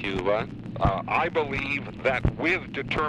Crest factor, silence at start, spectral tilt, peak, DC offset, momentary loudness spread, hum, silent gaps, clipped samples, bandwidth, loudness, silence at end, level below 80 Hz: 18 dB; 0 s; -7 dB/octave; -8 dBFS; under 0.1%; 4 LU; none; none; under 0.1%; 10 kHz; -26 LUFS; 0 s; -40 dBFS